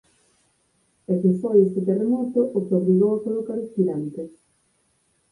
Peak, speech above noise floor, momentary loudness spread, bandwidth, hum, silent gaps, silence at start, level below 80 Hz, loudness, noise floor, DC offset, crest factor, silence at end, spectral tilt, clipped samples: -6 dBFS; 46 dB; 13 LU; 10.5 kHz; none; none; 1.1 s; -68 dBFS; -22 LUFS; -67 dBFS; under 0.1%; 18 dB; 1.05 s; -11.5 dB/octave; under 0.1%